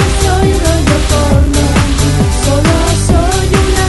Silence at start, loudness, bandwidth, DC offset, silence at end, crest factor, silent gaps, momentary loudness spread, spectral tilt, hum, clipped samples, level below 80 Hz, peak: 0 s; -11 LUFS; 12 kHz; 0.6%; 0 s; 10 dB; none; 1 LU; -5 dB/octave; none; under 0.1%; -14 dBFS; 0 dBFS